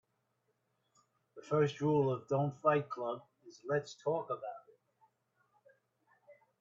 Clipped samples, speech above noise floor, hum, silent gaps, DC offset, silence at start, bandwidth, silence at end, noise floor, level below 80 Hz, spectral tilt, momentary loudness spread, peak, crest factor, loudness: under 0.1%; 46 dB; none; none; under 0.1%; 1.35 s; 7.6 kHz; 0.3 s; -81 dBFS; -78 dBFS; -7.5 dB/octave; 16 LU; -16 dBFS; 22 dB; -35 LUFS